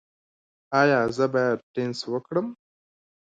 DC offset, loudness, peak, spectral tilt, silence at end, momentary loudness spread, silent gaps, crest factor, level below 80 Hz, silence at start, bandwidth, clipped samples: under 0.1%; -24 LUFS; -6 dBFS; -6 dB/octave; 0.7 s; 10 LU; 1.63-1.74 s; 20 dB; -64 dBFS; 0.7 s; 9.2 kHz; under 0.1%